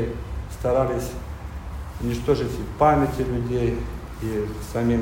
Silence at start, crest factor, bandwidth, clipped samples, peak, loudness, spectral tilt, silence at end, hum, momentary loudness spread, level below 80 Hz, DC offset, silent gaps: 0 s; 18 dB; 16.5 kHz; under 0.1%; -6 dBFS; -25 LUFS; -7 dB/octave; 0 s; none; 15 LU; -34 dBFS; under 0.1%; none